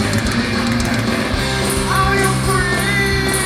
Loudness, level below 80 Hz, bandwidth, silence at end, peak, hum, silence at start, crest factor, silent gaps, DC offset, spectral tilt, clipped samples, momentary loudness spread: -16 LUFS; -28 dBFS; 15.5 kHz; 0 s; -4 dBFS; none; 0 s; 14 dB; none; under 0.1%; -4 dB/octave; under 0.1%; 3 LU